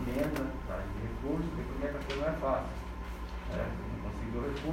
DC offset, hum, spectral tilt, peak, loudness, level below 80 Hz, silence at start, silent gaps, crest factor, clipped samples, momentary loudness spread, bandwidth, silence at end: under 0.1%; none; -7 dB/octave; -20 dBFS; -37 LUFS; -42 dBFS; 0 s; none; 16 dB; under 0.1%; 8 LU; 16 kHz; 0 s